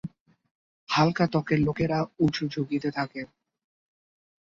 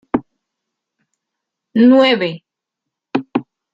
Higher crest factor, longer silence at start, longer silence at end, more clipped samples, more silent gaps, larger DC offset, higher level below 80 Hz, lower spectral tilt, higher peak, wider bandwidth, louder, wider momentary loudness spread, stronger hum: about the same, 20 dB vs 16 dB; about the same, 0.05 s vs 0.15 s; first, 1.15 s vs 0.3 s; neither; first, 0.20-0.26 s, 0.51-0.87 s vs none; neither; about the same, -56 dBFS vs -58 dBFS; about the same, -7 dB/octave vs -7 dB/octave; second, -8 dBFS vs -2 dBFS; about the same, 7.4 kHz vs 7.4 kHz; second, -26 LUFS vs -15 LUFS; about the same, 12 LU vs 14 LU; neither